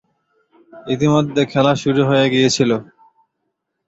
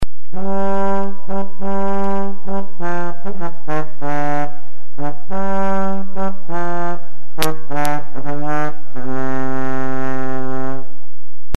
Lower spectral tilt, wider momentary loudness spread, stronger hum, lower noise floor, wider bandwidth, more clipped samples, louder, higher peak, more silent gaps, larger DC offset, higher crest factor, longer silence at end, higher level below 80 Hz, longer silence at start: about the same, -5.5 dB/octave vs -6.5 dB/octave; about the same, 8 LU vs 8 LU; neither; first, -74 dBFS vs -54 dBFS; second, 8.2 kHz vs 13.5 kHz; neither; first, -16 LUFS vs -24 LUFS; about the same, -2 dBFS vs 0 dBFS; neither; second, under 0.1% vs 50%; second, 16 dB vs 26 dB; first, 1.05 s vs 0.6 s; second, -54 dBFS vs -44 dBFS; first, 0.75 s vs 0 s